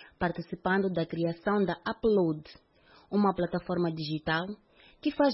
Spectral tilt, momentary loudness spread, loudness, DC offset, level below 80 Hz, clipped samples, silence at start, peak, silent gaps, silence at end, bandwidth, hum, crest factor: -10.5 dB/octave; 7 LU; -30 LUFS; under 0.1%; -58 dBFS; under 0.1%; 0 s; -12 dBFS; none; 0 s; 5.8 kHz; none; 18 dB